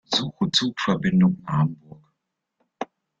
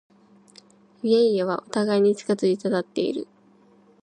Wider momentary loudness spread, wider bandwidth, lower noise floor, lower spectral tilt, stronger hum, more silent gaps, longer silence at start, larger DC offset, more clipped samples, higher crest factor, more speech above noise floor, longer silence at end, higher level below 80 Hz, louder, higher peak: first, 17 LU vs 10 LU; second, 7.8 kHz vs 10.5 kHz; first, -79 dBFS vs -56 dBFS; about the same, -5.5 dB/octave vs -6 dB/octave; neither; neither; second, 0.1 s vs 1.05 s; neither; neither; about the same, 18 dB vs 16 dB; first, 57 dB vs 34 dB; second, 0.35 s vs 0.8 s; first, -58 dBFS vs -76 dBFS; about the same, -22 LUFS vs -23 LUFS; about the same, -6 dBFS vs -8 dBFS